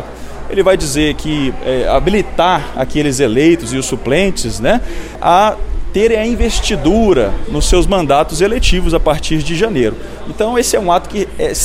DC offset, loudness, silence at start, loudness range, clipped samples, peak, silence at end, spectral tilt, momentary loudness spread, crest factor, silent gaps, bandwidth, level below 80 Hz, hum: under 0.1%; -14 LUFS; 0 s; 1 LU; under 0.1%; 0 dBFS; 0 s; -4.5 dB/octave; 7 LU; 12 dB; none; 16 kHz; -22 dBFS; none